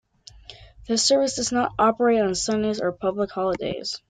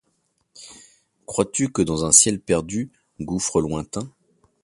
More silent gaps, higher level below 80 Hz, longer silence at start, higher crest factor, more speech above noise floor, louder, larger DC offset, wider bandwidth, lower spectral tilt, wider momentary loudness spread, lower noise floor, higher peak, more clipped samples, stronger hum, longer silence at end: neither; about the same, -52 dBFS vs -48 dBFS; about the same, 0.5 s vs 0.55 s; second, 16 dB vs 24 dB; second, 24 dB vs 48 dB; about the same, -22 LUFS vs -20 LUFS; neither; second, 9.6 kHz vs 15 kHz; about the same, -3.5 dB/octave vs -3.5 dB/octave; second, 7 LU vs 22 LU; second, -47 dBFS vs -70 dBFS; second, -8 dBFS vs 0 dBFS; neither; neither; second, 0.1 s vs 0.55 s